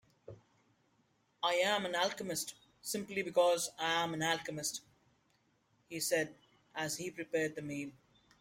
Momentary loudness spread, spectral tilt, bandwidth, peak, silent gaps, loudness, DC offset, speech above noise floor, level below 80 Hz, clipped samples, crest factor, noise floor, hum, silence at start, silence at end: 13 LU; -2.5 dB/octave; 16.5 kHz; -18 dBFS; none; -36 LUFS; under 0.1%; 39 dB; -78 dBFS; under 0.1%; 20 dB; -75 dBFS; none; 0.3 s; 0.5 s